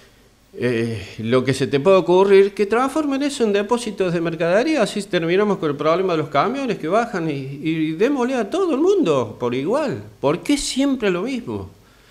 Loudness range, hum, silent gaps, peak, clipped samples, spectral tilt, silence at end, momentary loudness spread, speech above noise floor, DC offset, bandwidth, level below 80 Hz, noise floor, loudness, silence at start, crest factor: 3 LU; none; none; -4 dBFS; under 0.1%; -5.5 dB/octave; 0.4 s; 9 LU; 33 dB; under 0.1%; 13 kHz; -52 dBFS; -52 dBFS; -19 LUFS; 0.55 s; 16 dB